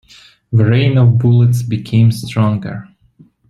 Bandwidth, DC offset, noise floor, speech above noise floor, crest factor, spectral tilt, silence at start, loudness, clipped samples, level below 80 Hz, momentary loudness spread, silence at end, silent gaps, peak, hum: 12 kHz; under 0.1%; -48 dBFS; 36 dB; 12 dB; -8 dB/octave; 0.5 s; -13 LUFS; under 0.1%; -46 dBFS; 9 LU; 0.7 s; none; -2 dBFS; none